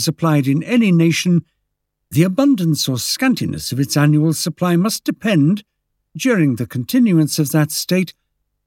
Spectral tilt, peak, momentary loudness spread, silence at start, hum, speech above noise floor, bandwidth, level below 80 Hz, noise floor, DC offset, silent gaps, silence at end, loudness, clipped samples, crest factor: -5.5 dB/octave; -2 dBFS; 6 LU; 0 s; none; 58 dB; 17 kHz; -56 dBFS; -74 dBFS; under 0.1%; none; 0.55 s; -16 LUFS; under 0.1%; 16 dB